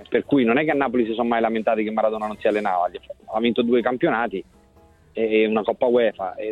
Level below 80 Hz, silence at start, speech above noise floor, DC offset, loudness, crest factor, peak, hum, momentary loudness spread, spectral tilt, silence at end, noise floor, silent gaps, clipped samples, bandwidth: -58 dBFS; 0 s; 32 dB; under 0.1%; -21 LUFS; 16 dB; -6 dBFS; none; 8 LU; -7.5 dB/octave; 0 s; -53 dBFS; none; under 0.1%; 8.6 kHz